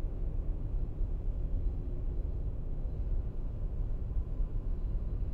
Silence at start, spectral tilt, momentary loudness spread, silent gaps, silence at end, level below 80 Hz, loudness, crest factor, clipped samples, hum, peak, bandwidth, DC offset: 0 s; -11 dB/octave; 2 LU; none; 0 s; -34 dBFS; -39 LUFS; 12 dB; under 0.1%; none; -22 dBFS; 1.7 kHz; under 0.1%